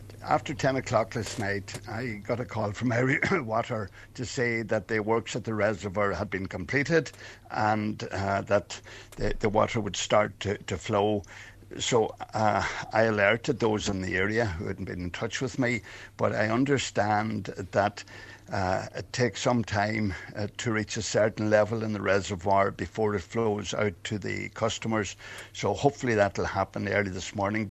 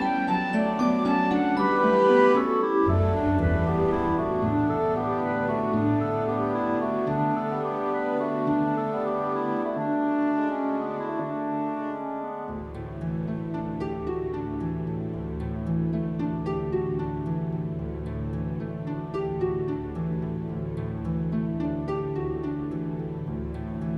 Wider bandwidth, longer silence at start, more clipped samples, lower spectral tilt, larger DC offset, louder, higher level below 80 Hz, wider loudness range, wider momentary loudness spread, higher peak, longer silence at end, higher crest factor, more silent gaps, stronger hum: first, 13 kHz vs 8.4 kHz; about the same, 0 s vs 0 s; neither; second, -5 dB/octave vs -9 dB/octave; neither; about the same, -28 LUFS vs -27 LUFS; second, -50 dBFS vs -44 dBFS; second, 2 LU vs 9 LU; about the same, 10 LU vs 9 LU; about the same, -8 dBFS vs -8 dBFS; about the same, 0 s vs 0 s; about the same, 20 dB vs 18 dB; neither; neither